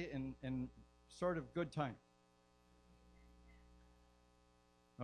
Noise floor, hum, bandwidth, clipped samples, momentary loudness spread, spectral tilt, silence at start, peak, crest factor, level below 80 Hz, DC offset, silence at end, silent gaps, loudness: -73 dBFS; 60 Hz at -70 dBFS; 11 kHz; under 0.1%; 12 LU; -7 dB/octave; 0 s; -26 dBFS; 22 dB; -66 dBFS; under 0.1%; 0 s; none; -45 LUFS